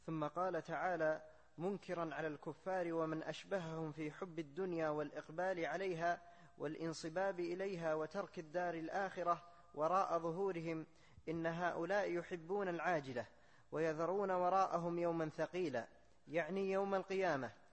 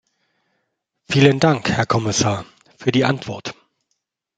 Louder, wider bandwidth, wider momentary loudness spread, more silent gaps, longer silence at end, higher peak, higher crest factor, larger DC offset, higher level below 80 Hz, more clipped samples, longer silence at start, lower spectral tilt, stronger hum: second, -41 LUFS vs -18 LUFS; about the same, 8.4 kHz vs 9.2 kHz; second, 9 LU vs 15 LU; neither; second, 0.2 s vs 0.85 s; second, -24 dBFS vs -2 dBFS; about the same, 18 dB vs 18 dB; neither; second, -76 dBFS vs -54 dBFS; neither; second, 0.05 s vs 1.1 s; about the same, -6 dB/octave vs -5 dB/octave; neither